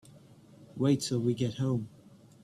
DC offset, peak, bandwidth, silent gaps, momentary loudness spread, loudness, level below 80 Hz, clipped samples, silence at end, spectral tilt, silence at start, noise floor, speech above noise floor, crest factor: under 0.1%; -14 dBFS; 13 kHz; none; 14 LU; -31 LUFS; -66 dBFS; under 0.1%; 0.55 s; -6.5 dB/octave; 0.15 s; -56 dBFS; 26 dB; 18 dB